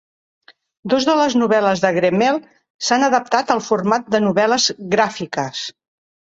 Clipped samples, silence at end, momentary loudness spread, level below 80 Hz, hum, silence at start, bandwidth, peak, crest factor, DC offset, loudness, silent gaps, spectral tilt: under 0.1%; 0.7 s; 9 LU; -60 dBFS; none; 0.85 s; 8 kHz; 0 dBFS; 18 dB; under 0.1%; -17 LUFS; 2.70-2.79 s; -4 dB/octave